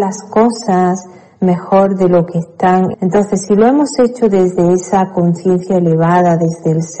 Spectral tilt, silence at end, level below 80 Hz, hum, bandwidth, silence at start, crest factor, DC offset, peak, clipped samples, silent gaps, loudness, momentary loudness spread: -7 dB/octave; 0 s; -50 dBFS; none; 9 kHz; 0 s; 10 dB; under 0.1%; -2 dBFS; under 0.1%; none; -12 LUFS; 5 LU